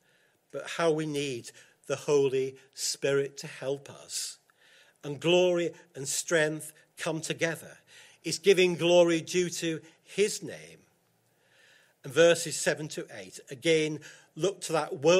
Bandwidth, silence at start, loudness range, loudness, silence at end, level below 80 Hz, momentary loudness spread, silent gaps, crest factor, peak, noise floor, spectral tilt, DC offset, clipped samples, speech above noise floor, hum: 16 kHz; 0.55 s; 4 LU; -29 LUFS; 0 s; -76 dBFS; 18 LU; none; 20 dB; -8 dBFS; -70 dBFS; -3.5 dB/octave; under 0.1%; under 0.1%; 41 dB; none